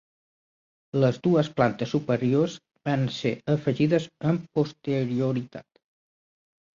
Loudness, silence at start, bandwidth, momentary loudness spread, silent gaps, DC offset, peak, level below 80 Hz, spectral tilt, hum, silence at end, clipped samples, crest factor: -26 LUFS; 0.95 s; 7.4 kHz; 7 LU; none; under 0.1%; -6 dBFS; -62 dBFS; -7.5 dB/octave; none; 1.15 s; under 0.1%; 20 dB